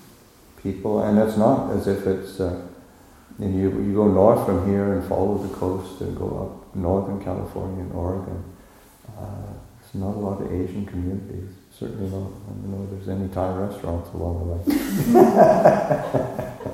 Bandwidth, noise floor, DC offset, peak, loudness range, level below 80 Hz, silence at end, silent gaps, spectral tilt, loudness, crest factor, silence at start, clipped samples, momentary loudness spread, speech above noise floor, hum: 16.5 kHz; -50 dBFS; under 0.1%; 0 dBFS; 11 LU; -44 dBFS; 0 s; none; -8 dB/octave; -22 LUFS; 22 dB; 0.55 s; under 0.1%; 18 LU; 28 dB; none